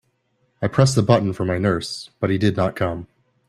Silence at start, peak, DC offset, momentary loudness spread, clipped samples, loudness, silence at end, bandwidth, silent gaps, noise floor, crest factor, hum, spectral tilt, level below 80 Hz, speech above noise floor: 0.6 s; 0 dBFS; under 0.1%; 9 LU; under 0.1%; -20 LUFS; 0.45 s; 12.5 kHz; none; -67 dBFS; 20 dB; none; -6 dB/octave; -50 dBFS; 47 dB